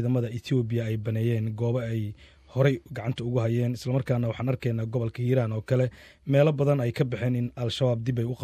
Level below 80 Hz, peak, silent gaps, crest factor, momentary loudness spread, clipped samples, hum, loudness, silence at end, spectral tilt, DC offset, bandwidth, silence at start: -54 dBFS; -8 dBFS; none; 18 dB; 6 LU; under 0.1%; none; -27 LUFS; 0 s; -8 dB/octave; under 0.1%; 14 kHz; 0 s